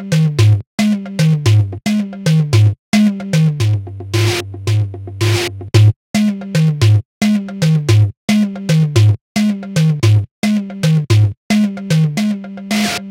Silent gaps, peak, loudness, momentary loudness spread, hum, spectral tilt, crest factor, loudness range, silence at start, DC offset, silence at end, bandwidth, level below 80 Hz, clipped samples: 0.67-0.78 s, 2.79-2.92 s, 5.96-6.14 s, 7.05-7.21 s, 8.17-8.28 s, 9.21-9.35 s, 10.31-10.42 s, 11.37-11.50 s; 0 dBFS; -15 LUFS; 6 LU; none; -6.5 dB/octave; 14 dB; 2 LU; 0 s; under 0.1%; 0 s; 15.5 kHz; -44 dBFS; under 0.1%